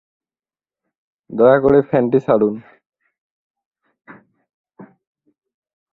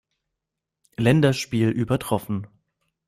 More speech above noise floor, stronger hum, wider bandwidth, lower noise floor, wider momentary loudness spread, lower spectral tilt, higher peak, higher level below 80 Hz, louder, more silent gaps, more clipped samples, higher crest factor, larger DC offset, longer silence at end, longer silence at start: first, over 76 dB vs 63 dB; neither; second, 4.2 kHz vs 15 kHz; first, under -90 dBFS vs -84 dBFS; about the same, 13 LU vs 13 LU; first, -10 dB/octave vs -6.5 dB/octave; first, 0 dBFS vs -6 dBFS; about the same, -52 dBFS vs -54 dBFS; first, -15 LUFS vs -22 LUFS; first, 3.18-3.54 s, 3.66-3.71 s, 4.54-4.64 s vs none; neither; about the same, 20 dB vs 18 dB; neither; first, 1.1 s vs 0.6 s; first, 1.3 s vs 1 s